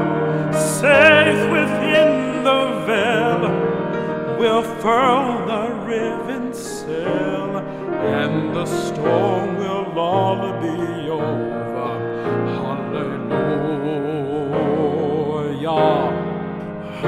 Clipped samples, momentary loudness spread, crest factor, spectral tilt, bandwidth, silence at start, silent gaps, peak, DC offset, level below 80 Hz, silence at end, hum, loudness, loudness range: under 0.1%; 9 LU; 18 dB; -5.5 dB/octave; 16 kHz; 0 s; none; 0 dBFS; under 0.1%; -56 dBFS; 0 s; none; -19 LUFS; 7 LU